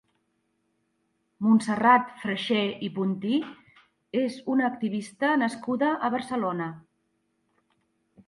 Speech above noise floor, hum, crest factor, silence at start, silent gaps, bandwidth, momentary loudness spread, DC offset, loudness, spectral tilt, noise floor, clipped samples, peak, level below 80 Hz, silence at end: 49 dB; none; 20 dB; 1.4 s; none; 11.5 kHz; 10 LU; under 0.1%; -26 LUFS; -6 dB/octave; -74 dBFS; under 0.1%; -8 dBFS; -74 dBFS; 1.5 s